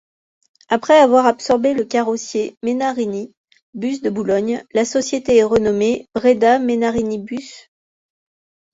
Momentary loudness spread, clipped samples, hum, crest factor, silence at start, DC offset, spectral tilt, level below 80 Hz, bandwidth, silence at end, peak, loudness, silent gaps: 13 LU; under 0.1%; none; 16 dB; 0.7 s; under 0.1%; -4.5 dB/octave; -52 dBFS; 8 kHz; 1.15 s; -2 dBFS; -17 LUFS; 2.57-2.61 s, 3.37-3.48 s, 3.62-3.73 s